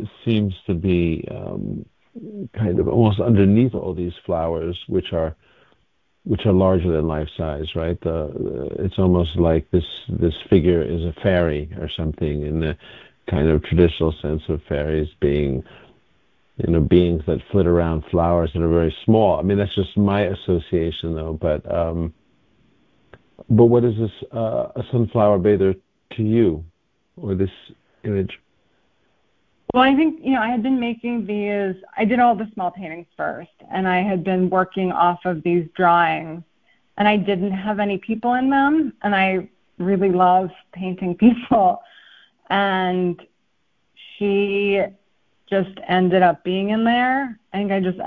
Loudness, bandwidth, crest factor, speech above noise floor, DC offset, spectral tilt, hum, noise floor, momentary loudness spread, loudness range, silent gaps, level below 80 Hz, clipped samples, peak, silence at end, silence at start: -20 LUFS; 4.6 kHz; 18 dB; 51 dB; under 0.1%; -10 dB/octave; none; -70 dBFS; 12 LU; 4 LU; none; -36 dBFS; under 0.1%; -2 dBFS; 0 s; 0 s